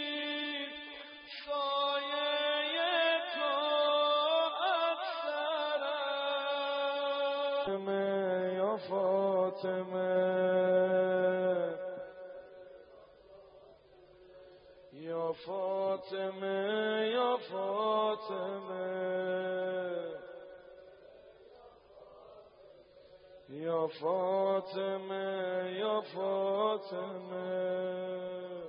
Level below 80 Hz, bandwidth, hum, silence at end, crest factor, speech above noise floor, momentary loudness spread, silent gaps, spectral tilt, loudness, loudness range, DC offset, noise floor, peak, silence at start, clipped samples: -80 dBFS; 5.2 kHz; none; 0 s; 16 dB; 27 dB; 12 LU; none; -2 dB/octave; -33 LUFS; 11 LU; under 0.1%; -59 dBFS; -18 dBFS; 0 s; under 0.1%